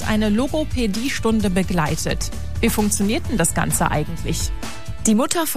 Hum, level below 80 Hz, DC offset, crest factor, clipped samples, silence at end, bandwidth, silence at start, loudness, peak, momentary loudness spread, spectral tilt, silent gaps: none; -32 dBFS; 4%; 20 dB; under 0.1%; 0 s; 16 kHz; 0 s; -21 LUFS; -2 dBFS; 7 LU; -4.5 dB/octave; none